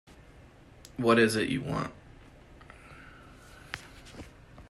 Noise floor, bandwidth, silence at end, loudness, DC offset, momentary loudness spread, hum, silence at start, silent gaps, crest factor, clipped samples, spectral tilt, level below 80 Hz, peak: -54 dBFS; 13 kHz; 0.05 s; -28 LUFS; under 0.1%; 28 LU; none; 1 s; none; 24 dB; under 0.1%; -5 dB/octave; -56 dBFS; -10 dBFS